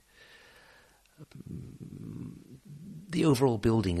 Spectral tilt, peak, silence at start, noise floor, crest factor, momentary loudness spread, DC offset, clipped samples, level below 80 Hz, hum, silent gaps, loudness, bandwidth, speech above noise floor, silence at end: -7 dB/octave; -14 dBFS; 1.2 s; -61 dBFS; 18 dB; 24 LU; under 0.1%; under 0.1%; -54 dBFS; none; none; -28 LUFS; 13 kHz; 33 dB; 0 s